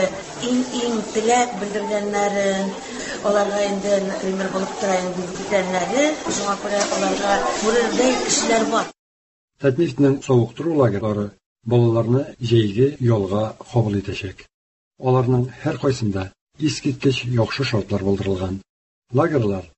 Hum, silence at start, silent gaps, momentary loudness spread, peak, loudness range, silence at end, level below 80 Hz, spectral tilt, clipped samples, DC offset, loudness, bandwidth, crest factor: none; 0 s; 8.99-9.48 s, 11.46-11.56 s, 14.54-14.91 s, 16.41-16.47 s, 18.69-19.02 s; 8 LU; -4 dBFS; 3 LU; 0.1 s; -48 dBFS; -5 dB/octave; under 0.1%; under 0.1%; -21 LUFS; 8.6 kHz; 16 dB